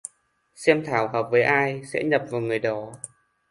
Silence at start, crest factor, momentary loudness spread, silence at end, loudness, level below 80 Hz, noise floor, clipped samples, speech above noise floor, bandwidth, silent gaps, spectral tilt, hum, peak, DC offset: 0.6 s; 22 dB; 18 LU; 0.45 s; -23 LUFS; -66 dBFS; -64 dBFS; under 0.1%; 41 dB; 11.5 kHz; none; -5 dB/octave; none; -2 dBFS; under 0.1%